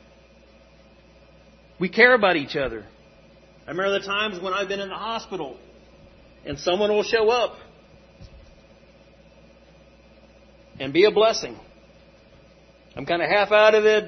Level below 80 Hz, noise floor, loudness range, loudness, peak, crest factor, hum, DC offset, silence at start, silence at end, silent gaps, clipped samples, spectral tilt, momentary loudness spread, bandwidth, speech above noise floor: -54 dBFS; -52 dBFS; 6 LU; -21 LUFS; -2 dBFS; 24 dB; none; under 0.1%; 1.8 s; 0 s; none; under 0.1%; -4 dB/octave; 19 LU; 6.4 kHz; 31 dB